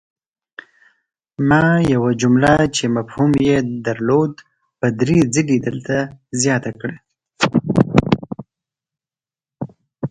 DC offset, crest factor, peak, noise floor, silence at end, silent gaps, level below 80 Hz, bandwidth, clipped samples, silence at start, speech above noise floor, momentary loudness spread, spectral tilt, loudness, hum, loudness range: under 0.1%; 18 dB; 0 dBFS; under -90 dBFS; 0 s; none; -44 dBFS; 11 kHz; under 0.1%; 1.4 s; over 74 dB; 16 LU; -5.5 dB/octave; -17 LUFS; none; 4 LU